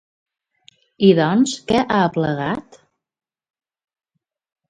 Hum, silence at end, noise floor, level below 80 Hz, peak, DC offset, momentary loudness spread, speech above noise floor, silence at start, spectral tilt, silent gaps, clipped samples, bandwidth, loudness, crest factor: none; 2.1 s; -55 dBFS; -54 dBFS; 0 dBFS; under 0.1%; 10 LU; 38 dB; 1 s; -6 dB/octave; none; under 0.1%; 9.4 kHz; -18 LUFS; 20 dB